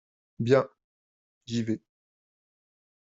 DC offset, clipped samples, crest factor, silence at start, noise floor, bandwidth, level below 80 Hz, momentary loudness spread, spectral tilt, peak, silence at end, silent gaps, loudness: under 0.1%; under 0.1%; 24 dB; 0.4 s; under -90 dBFS; 7.8 kHz; -70 dBFS; 11 LU; -6 dB/octave; -8 dBFS; 1.3 s; 0.84-1.41 s; -28 LUFS